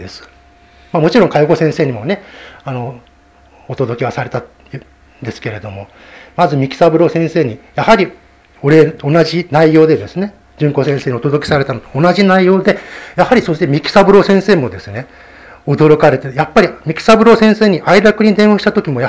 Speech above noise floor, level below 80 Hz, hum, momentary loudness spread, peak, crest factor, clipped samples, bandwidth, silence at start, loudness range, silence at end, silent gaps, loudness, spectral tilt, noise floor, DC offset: 34 dB; -44 dBFS; none; 18 LU; 0 dBFS; 12 dB; 0.7%; 8 kHz; 0 s; 11 LU; 0 s; none; -11 LUFS; -7 dB/octave; -45 dBFS; under 0.1%